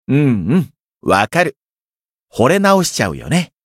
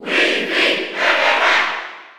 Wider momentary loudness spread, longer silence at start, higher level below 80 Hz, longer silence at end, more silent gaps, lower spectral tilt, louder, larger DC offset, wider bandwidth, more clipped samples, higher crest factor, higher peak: first, 9 LU vs 5 LU; about the same, 0.1 s vs 0 s; first, -46 dBFS vs -70 dBFS; first, 0.25 s vs 0.05 s; first, 1.64-1.68 s, 1.80-1.94 s, 2.05-2.27 s vs none; first, -5.5 dB/octave vs -1.5 dB/octave; about the same, -15 LUFS vs -15 LUFS; neither; second, 16 kHz vs 18.5 kHz; neither; about the same, 16 dB vs 14 dB; about the same, 0 dBFS vs -2 dBFS